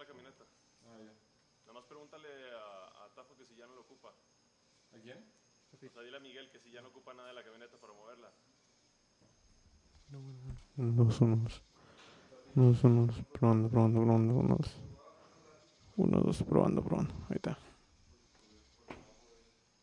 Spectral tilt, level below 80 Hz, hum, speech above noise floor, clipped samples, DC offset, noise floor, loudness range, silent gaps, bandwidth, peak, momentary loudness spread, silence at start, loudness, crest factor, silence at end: -9 dB/octave; -60 dBFS; none; 39 dB; under 0.1%; under 0.1%; -71 dBFS; 25 LU; none; 10 kHz; -12 dBFS; 26 LU; 0 s; -31 LUFS; 24 dB; 0.9 s